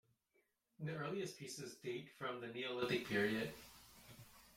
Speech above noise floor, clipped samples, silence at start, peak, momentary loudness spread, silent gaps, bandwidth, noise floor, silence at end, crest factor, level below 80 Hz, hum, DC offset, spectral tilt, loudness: 38 dB; under 0.1%; 0.8 s; -26 dBFS; 21 LU; none; 16.5 kHz; -82 dBFS; 0 s; 20 dB; -76 dBFS; none; under 0.1%; -4.5 dB/octave; -44 LUFS